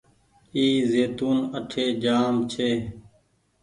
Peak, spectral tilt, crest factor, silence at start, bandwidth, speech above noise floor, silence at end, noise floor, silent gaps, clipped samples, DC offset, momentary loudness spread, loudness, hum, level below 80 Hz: -10 dBFS; -5.5 dB/octave; 14 dB; 0.55 s; 11 kHz; 41 dB; 0.6 s; -64 dBFS; none; under 0.1%; under 0.1%; 8 LU; -24 LUFS; none; -56 dBFS